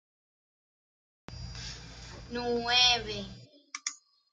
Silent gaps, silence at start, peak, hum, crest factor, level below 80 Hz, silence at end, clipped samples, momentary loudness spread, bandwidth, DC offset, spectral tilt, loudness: none; 1.3 s; -10 dBFS; none; 24 dB; -54 dBFS; 0.35 s; under 0.1%; 23 LU; 11 kHz; under 0.1%; -2 dB/octave; -28 LUFS